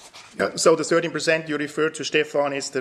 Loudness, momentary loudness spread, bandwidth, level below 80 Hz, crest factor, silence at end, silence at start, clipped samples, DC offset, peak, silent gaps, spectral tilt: -22 LUFS; 8 LU; 14 kHz; -68 dBFS; 20 dB; 0 s; 0 s; under 0.1%; under 0.1%; -4 dBFS; none; -3.5 dB/octave